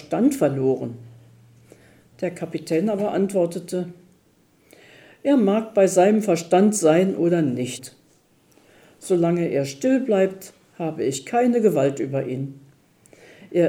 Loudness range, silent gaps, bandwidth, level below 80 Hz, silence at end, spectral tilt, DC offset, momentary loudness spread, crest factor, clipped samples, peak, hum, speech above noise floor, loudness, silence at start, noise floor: 7 LU; none; 17.5 kHz; -68 dBFS; 0 s; -6 dB/octave; under 0.1%; 13 LU; 18 dB; under 0.1%; -4 dBFS; none; 39 dB; -21 LUFS; 0 s; -59 dBFS